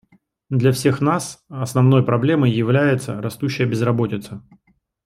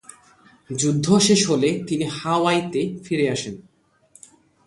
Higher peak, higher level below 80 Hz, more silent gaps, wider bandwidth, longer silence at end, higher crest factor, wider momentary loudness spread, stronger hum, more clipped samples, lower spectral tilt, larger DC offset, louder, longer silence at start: about the same, -2 dBFS vs -4 dBFS; about the same, -58 dBFS vs -60 dBFS; neither; first, 14 kHz vs 11.5 kHz; second, 0.65 s vs 1.05 s; about the same, 16 dB vs 18 dB; about the same, 13 LU vs 12 LU; neither; neither; first, -7 dB/octave vs -4.5 dB/octave; neither; about the same, -19 LUFS vs -20 LUFS; second, 0.5 s vs 0.7 s